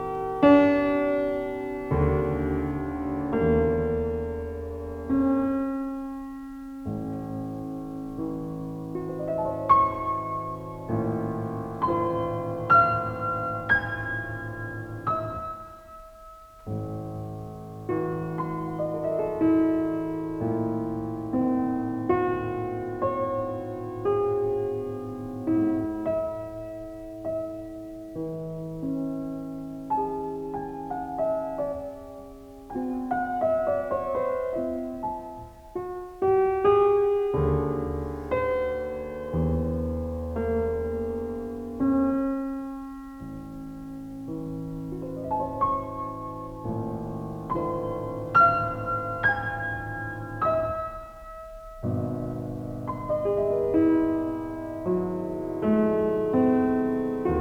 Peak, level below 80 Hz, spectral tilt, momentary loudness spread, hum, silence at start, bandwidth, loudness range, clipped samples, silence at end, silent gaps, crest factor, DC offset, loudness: -6 dBFS; -46 dBFS; -9 dB/octave; 14 LU; none; 0 s; 17.5 kHz; 8 LU; under 0.1%; 0 s; none; 22 dB; under 0.1%; -27 LUFS